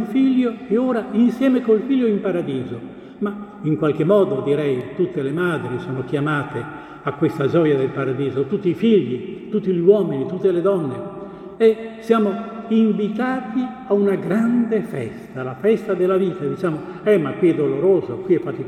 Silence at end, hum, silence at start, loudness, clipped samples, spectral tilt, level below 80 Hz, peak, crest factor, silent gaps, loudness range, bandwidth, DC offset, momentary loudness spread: 0 s; none; 0 s; -20 LUFS; under 0.1%; -8.5 dB/octave; -58 dBFS; -2 dBFS; 18 dB; none; 2 LU; 12 kHz; under 0.1%; 11 LU